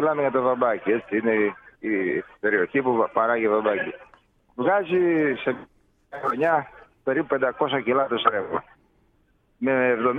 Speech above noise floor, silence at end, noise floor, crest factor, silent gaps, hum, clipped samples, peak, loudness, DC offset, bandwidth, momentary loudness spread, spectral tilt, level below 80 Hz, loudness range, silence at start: 41 dB; 0 s; -64 dBFS; 20 dB; none; none; under 0.1%; -4 dBFS; -23 LUFS; under 0.1%; 4 kHz; 10 LU; -8 dB/octave; -64 dBFS; 2 LU; 0 s